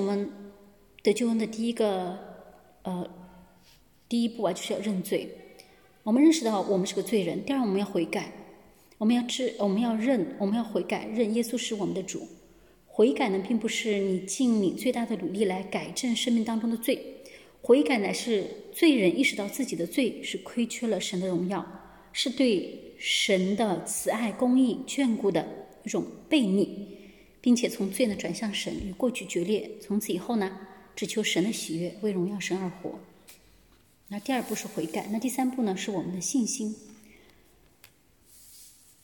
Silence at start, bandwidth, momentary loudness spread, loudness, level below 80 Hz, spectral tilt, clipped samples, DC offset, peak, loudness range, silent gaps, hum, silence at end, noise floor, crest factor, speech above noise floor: 0 s; 17.5 kHz; 13 LU; -28 LUFS; -64 dBFS; -4.5 dB/octave; under 0.1%; under 0.1%; -10 dBFS; 6 LU; none; none; 0.35 s; -61 dBFS; 20 dB; 34 dB